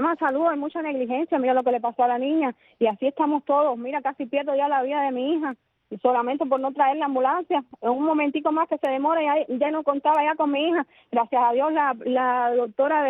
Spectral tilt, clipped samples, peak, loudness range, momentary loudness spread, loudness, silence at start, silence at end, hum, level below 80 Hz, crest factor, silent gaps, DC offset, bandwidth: -2 dB/octave; under 0.1%; -8 dBFS; 2 LU; 6 LU; -23 LUFS; 0 s; 0 s; none; -74 dBFS; 16 dB; none; under 0.1%; 4 kHz